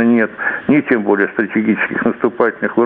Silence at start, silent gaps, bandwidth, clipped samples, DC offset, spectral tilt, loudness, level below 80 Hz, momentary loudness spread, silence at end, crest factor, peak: 0 s; none; 3.9 kHz; under 0.1%; under 0.1%; -10 dB/octave; -15 LUFS; -56 dBFS; 3 LU; 0 s; 14 dB; 0 dBFS